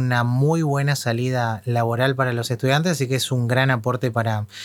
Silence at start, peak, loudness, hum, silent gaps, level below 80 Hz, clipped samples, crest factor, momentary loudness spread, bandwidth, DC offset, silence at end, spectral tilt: 0 s; -4 dBFS; -21 LUFS; none; none; -64 dBFS; under 0.1%; 18 dB; 4 LU; 17 kHz; under 0.1%; 0 s; -5.5 dB/octave